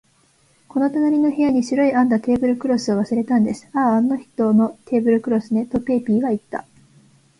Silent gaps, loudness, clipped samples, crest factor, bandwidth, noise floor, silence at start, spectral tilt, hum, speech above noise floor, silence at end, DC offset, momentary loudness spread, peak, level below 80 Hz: none; -19 LUFS; under 0.1%; 14 dB; 11 kHz; -58 dBFS; 0.75 s; -7 dB/octave; none; 40 dB; 0.8 s; under 0.1%; 5 LU; -6 dBFS; -54 dBFS